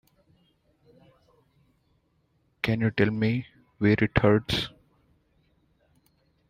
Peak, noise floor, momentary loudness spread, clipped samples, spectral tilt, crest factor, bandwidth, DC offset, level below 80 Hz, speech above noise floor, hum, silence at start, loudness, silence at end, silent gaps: -6 dBFS; -69 dBFS; 10 LU; under 0.1%; -7 dB/octave; 22 dB; 15 kHz; under 0.1%; -50 dBFS; 46 dB; none; 2.65 s; -25 LUFS; 1.8 s; none